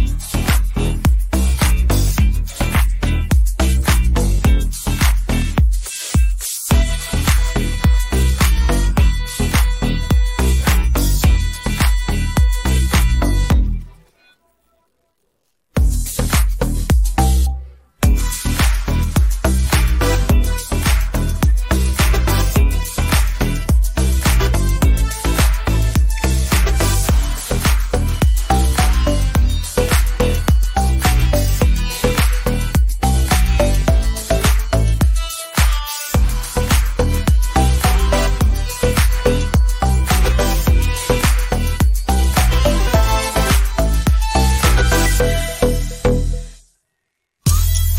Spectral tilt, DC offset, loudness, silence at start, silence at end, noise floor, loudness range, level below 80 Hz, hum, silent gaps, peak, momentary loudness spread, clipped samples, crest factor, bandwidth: -5 dB/octave; under 0.1%; -17 LUFS; 0 s; 0 s; -74 dBFS; 2 LU; -16 dBFS; none; none; -2 dBFS; 4 LU; under 0.1%; 12 dB; 16.5 kHz